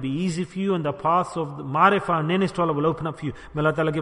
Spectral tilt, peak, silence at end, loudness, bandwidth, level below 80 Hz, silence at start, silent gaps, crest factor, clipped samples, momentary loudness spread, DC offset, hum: -7 dB/octave; -4 dBFS; 0 s; -23 LUFS; 11 kHz; -52 dBFS; 0 s; none; 20 dB; under 0.1%; 11 LU; under 0.1%; none